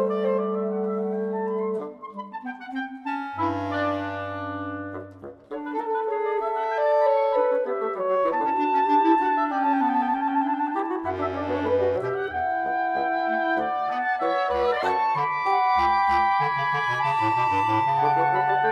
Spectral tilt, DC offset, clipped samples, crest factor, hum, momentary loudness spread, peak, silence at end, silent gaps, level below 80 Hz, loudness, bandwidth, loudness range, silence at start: -7 dB/octave; under 0.1%; under 0.1%; 14 dB; none; 11 LU; -10 dBFS; 0 s; none; -58 dBFS; -24 LUFS; 9.4 kHz; 7 LU; 0 s